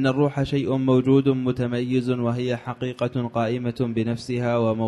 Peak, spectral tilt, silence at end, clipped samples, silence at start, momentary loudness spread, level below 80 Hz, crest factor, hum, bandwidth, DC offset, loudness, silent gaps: -8 dBFS; -8 dB/octave; 0 s; under 0.1%; 0 s; 7 LU; -52 dBFS; 16 dB; none; 11 kHz; under 0.1%; -23 LUFS; none